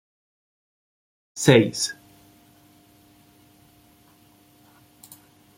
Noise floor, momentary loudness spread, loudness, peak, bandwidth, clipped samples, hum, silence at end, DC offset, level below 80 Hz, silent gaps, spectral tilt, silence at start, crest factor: -56 dBFS; 25 LU; -20 LUFS; -2 dBFS; 16.5 kHz; under 0.1%; none; 3.65 s; under 0.1%; -62 dBFS; none; -4.5 dB/octave; 1.35 s; 26 dB